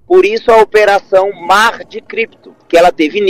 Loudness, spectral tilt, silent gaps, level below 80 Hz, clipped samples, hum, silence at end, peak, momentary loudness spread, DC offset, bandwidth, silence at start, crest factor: -10 LUFS; -3.5 dB/octave; none; -44 dBFS; 0.2%; none; 0 s; 0 dBFS; 11 LU; under 0.1%; 16 kHz; 0.1 s; 10 dB